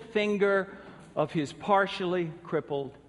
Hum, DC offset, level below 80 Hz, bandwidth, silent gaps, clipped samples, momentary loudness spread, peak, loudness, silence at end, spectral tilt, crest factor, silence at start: none; under 0.1%; -66 dBFS; 11 kHz; none; under 0.1%; 11 LU; -12 dBFS; -29 LUFS; 0.1 s; -6 dB/octave; 18 dB; 0 s